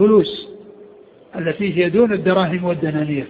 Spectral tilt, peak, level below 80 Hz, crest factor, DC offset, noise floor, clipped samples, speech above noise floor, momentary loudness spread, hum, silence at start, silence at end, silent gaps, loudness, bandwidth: -10 dB/octave; -2 dBFS; -54 dBFS; 16 dB; under 0.1%; -44 dBFS; under 0.1%; 28 dB; 14 LU; none; 0 s; 0 s; none; -18 LUFS; 4.9 kHz